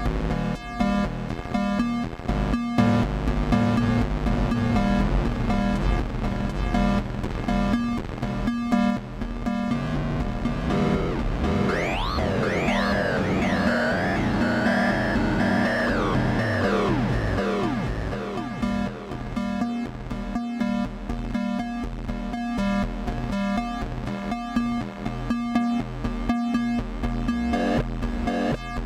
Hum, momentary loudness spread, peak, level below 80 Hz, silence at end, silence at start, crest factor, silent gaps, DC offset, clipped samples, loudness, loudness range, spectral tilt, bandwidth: none; 8 LU; -8 dBFS; -32 dBFS; 0 s; 0 s; 16 dB; none; under 0.1%; under 0.1%; -25 LUFS; 6 LU; -7 dB/octave; 12.5 kHz